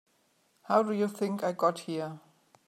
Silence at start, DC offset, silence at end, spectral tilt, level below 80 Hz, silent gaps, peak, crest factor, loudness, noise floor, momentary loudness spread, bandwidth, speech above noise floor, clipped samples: 0.7 s; under 0.1%; 0.5 s; -6 dB/octave; -86 dBFS; none; -12 dBFS; 20 dB; -30 LUFS; -70 dBFS; 11 LU; 14.5 kHz; 41 dB; under 0.1%